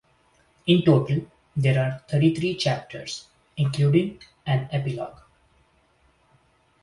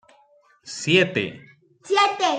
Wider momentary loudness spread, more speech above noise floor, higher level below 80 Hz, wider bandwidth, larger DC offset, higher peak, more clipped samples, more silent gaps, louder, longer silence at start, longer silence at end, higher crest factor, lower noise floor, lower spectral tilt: about the same, 14 LU vs 13 LU; about the same, 40 dB vs 37 dB; first, -58 dBFS vs -68 dBFS; first, 11 kHz vs 9.4 kHz; neither; about the same, -4 dBFS vs -4 dBFS; neither; neither; second, -24 LUFS vs -21 LUFS; about the same, 0.65 s vs 0.65 s; first, 1.7 s vs 0 s; about the same, 20 dB vs 20 dB; first, -63 dBFS vs -58 dBFS; first, -7 dB/octave vs -4 dB/octave